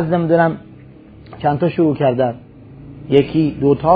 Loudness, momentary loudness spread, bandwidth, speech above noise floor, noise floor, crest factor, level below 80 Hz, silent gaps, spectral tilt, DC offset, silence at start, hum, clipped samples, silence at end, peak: -16 LUFS; 18 LU; 5 kHz; 25 dB; -40 dBFS; 16 dB; -46 dBFS; none; -10.5 dB/octave; under 0.1%; 0 s; none; under 0.1%; 0 s; 0 dBFS